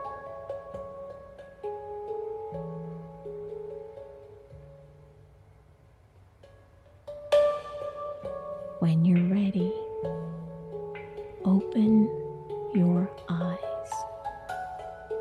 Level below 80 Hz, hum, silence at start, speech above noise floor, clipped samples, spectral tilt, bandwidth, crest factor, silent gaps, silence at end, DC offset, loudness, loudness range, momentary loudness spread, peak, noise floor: -60 dBFS; none; 0 s; 34 dB; under 0.1%; -8.5 dB/octave; 10 kHz; 18 dB; none; 0 s; under 0.1%; -30 LUFS; 16 LU; 20 LU; -14 dBFS; -57 dBFS